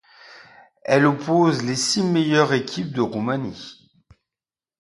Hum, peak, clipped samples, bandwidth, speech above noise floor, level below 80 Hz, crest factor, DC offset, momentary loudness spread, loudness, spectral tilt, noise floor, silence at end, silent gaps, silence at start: none; -2 dBFS; under 0.1%; 11.5 kHz; over 70 dB; -62 dBFS; 20 dB; under 0.1%; 14 LU; -20 LUFS; -5 dB/octave; under -90 dBFS; 1.1 s; none; 0.3 s